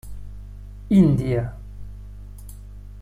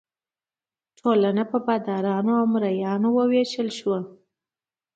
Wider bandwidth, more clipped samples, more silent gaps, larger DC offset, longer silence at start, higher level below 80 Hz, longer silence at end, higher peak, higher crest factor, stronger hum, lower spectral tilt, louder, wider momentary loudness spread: first, 15 kHz vs 8 kHz; neither; neither; neither; second, 0.05 s vs 1.05 s; first, -38 dBFS vs -74 dBFS; second, 0 s vs 0.85 s; about the same, -6 dBFS vs -8 dBFS; about the same, 18 dB vs 16 dB; first, 50 Hz at -35 dBFS vs none; first, -9 dB/octave vs -7 dB/octave; first, -20 LUFS vs -23 LUFS; first, 25 LU vs 7 LU